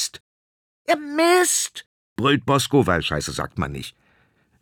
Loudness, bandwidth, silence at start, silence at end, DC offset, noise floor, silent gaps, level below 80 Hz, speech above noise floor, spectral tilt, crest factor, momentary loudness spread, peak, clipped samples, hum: -21 LUFS; 20 kHz; 0 s; 0.7 s; under 0.1%; -62 dBFS; 0.20-0.85 s, 1.86-2.16 s; -48 dBFS; 41 dB; -3.5 dB/octave; 18 dB; 18 LU; -4 dBFS; under 0.1%; none